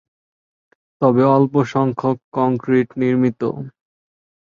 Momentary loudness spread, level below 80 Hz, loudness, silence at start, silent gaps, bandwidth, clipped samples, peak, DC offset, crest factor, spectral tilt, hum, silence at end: 11 LU; -60 dBFS; -18 LUFS; 1 s; 2.24-2.32 s; 7 kHz; under 0.1%; -2 dBFS; under 0.1%; 18 dB; -9 dB/octave; none; 0.8 s